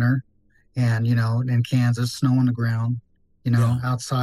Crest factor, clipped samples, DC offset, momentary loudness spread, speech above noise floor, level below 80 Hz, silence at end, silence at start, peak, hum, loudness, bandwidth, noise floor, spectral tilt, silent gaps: 12 dB; under 0.1%; under 0.1%; 7 LU; 39 dB; -58 dBFS; 0 s; 0 s; -10 dBFS; none; -22 LUFS; 12.5 kHz; -60 dBFS; -7 dB/octave; none